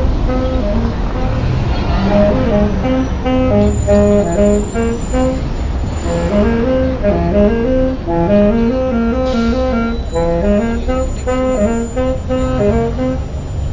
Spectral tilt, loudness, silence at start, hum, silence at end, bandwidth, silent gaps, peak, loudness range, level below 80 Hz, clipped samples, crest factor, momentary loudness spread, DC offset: -7.5 dB/octave; -15 LUFS; 0 s; none; 0 s; 7.6 kHz; none; -2 dBFS; 3 LU; -20 dBFS; under 0.1%; 12 dB; 6 LU; under 0.1%